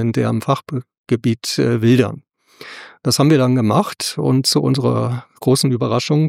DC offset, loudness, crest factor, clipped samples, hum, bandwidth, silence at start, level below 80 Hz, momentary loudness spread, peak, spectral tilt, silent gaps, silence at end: under 0.1%; -17 LUFS; 16 dB; under 0.1%; none; 16 kHz; 0 s; -58 dBFS; 12 LU; -2 dBFS; -5.5 dB/octave; 0.98-1.04 s; 0 s